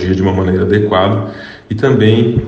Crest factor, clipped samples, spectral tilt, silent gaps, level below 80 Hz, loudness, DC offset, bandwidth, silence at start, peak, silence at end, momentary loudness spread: 12 dB; under 0.1%; -8 dB/octave; none; -36 dBFS; -12 LUFS; under 0.1%; 7.2 kHz; 0 s; 0 dBFS; 0 s; 14 LU